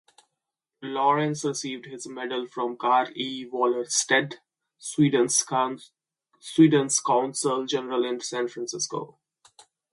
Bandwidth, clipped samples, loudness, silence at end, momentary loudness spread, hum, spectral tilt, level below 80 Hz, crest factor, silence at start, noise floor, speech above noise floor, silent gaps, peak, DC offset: 11.5 kHz; under 0.1%; -25 LUFS; 0.85 s; 16 LU; none; -3.5 dB/octave; -74 dBFS; 20 dB; 0.8 s; -85 dBFS; 60 dB; none; -6 dBFS; under 0.1%